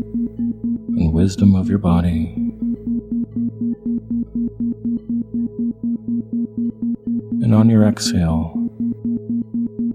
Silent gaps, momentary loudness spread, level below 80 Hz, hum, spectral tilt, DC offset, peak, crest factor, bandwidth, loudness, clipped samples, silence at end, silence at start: none; 10 LU; -38 dBFS; none; -7 dB/octave; under 0.1%; 0 dBFS; 18 dB; 11.5 kHz; -20 LUFS; under 0.1%; 0 s; 0 s